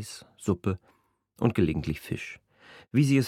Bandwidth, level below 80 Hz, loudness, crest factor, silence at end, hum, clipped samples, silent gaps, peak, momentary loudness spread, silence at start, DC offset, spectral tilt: 15.5 kHz; -50 dBFS; -29 LUFS; 22 dB; 0 s; none; under 0.1%; none; -8 dBFS; 15 LU; 0 s; under 0.1%; -7 dB/octave